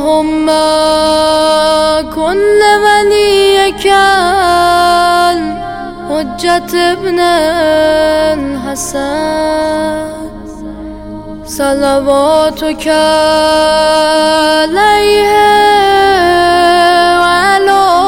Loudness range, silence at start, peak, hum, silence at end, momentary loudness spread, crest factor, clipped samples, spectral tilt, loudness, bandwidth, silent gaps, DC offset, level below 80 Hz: 6 LU; 0 s; 0 dBFS; none; 0 s; 11 LU; 10 dB; 0.4%; -3 dB/octave; -9 LUFS; 17 kHz; none; under 0.1%; -34 dBFS